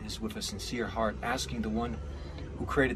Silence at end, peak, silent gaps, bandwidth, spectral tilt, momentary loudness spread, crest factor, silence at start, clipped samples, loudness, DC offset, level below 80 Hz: 0 s; -14 dBFS; none; 14 kHz; -4.5 dB/octave; 10 LU; 20 dB; 0 s; under 0.1%; -34 LUFS; under 0.1%; -44 dBFS